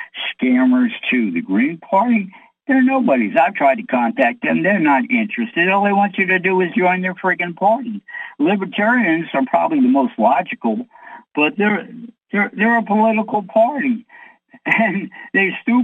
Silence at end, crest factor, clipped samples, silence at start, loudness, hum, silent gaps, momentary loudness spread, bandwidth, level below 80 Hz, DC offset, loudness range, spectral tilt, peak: 0 s; 14 dB; under 0.1%; 0 s; -17 LUFS; none; none; 8 LU; 4 kHz; -70 dBFS; under 0.1%; 2 LU; -8 dB/octave; -2 dBFS